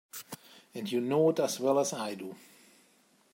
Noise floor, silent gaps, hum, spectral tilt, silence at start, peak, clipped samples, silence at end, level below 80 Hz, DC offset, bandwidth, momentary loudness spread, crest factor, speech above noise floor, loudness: -66 dBFS; none; none; -4.5 dB/octave; 0.15 s; -16 dBFS; under 0.1%; 0.95 s; -82 dBFS; under 0.1%; 16 kHz; 20 LU; 16 dB; 36 dB; -30 LUFS